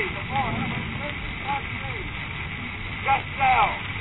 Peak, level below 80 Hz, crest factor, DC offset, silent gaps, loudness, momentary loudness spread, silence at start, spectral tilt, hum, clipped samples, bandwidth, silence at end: -8 dBFS; -40 dBFS; 18 dB; 0.3%; none; -26 LUFS; 10 LU; 0 s; -8.5 dB/octave; none; under 0.1%; 4.1 kHz; 0 s